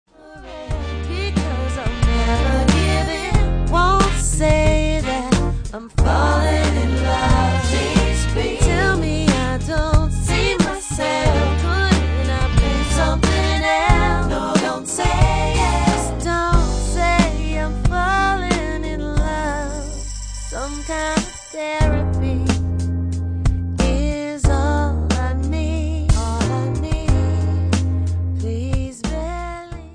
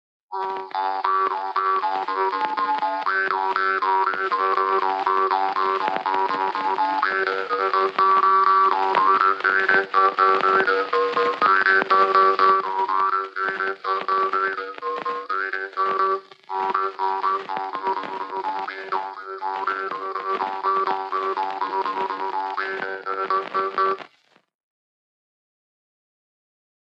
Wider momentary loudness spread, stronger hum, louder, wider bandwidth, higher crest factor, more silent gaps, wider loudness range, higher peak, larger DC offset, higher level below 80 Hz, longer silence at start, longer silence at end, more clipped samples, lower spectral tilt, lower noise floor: about the same, 9 LU vs 11 LU; neither; first, -19 LUFS vs -22 LUFS; first, 10.5 kHz vs 7.6 kHz; about the same, 18 dB vs 20 dB; neither; second, 4 LU vs 9 LU; first, 0 dBFS vs -4 dBFS; neither; first, -22 dBFS vs under -90 dBFS; about the same, 0.25 s vs 0.3 s; second, 0 s vs 2.85 s; neither; first, -5.5 dB/octave vs -4 dB/octave; second, -38 dBFS vs -59 dBFS